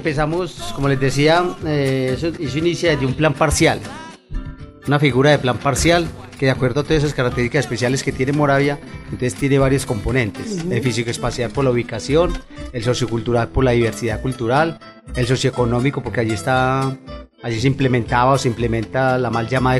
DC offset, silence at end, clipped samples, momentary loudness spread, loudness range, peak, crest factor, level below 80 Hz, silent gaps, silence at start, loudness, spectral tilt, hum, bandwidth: under 0.1%; 0 s; under 0.1%; 11 LU; 2 LU; -2 dBFS; 16 dB; -34 dBFS; none; 0 s; -18 LUFS; -5.5 dB/octave; none; 13 kHz